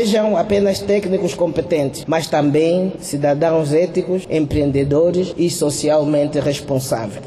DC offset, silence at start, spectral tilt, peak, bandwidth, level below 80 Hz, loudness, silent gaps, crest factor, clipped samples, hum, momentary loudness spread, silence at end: under 0.1%; 0 s; -6 dB/octave; -6 dBFS; 13.5 kHz; -42 dBFS; -17 LUFS; none; 10 dB; under 0.1%; none; 5 LU; 0 s